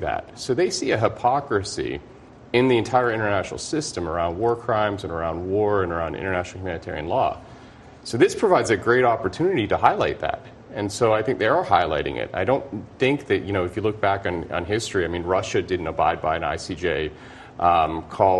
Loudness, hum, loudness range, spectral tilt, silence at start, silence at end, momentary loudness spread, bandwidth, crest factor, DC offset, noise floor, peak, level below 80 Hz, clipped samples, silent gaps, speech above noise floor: -23 LUFS; none; 3 LU; -5 dB/octave; 0 s; 0 s; 10 LU; 11.5 kHz; 22 dB; under 0.1%; -45 dBFS; 0 dBFS; -48 dBFS; under 0.1%; none; 22 dB